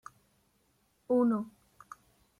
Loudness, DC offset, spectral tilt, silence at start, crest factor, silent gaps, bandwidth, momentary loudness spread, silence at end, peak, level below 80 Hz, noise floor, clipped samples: -30 LUFS; under 0.1%; -8.5 dB/octave; 1.1 s; 18 dB; none; 10.5 kHz; 25 LU; 0.9 s; -18 dBFS; -76 dBFS; -72 dBFS; under 0.1%